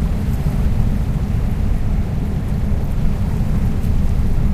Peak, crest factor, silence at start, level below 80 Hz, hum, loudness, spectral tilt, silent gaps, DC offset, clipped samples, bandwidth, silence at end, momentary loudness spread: -2 dBFS; 14 dB; 0 s; -18 dBFS; none; -20 LUFS; -8.5 dB/octave; none; under 0.1%; under 0.1%; 14.5 kHz; 0 s; 2 LU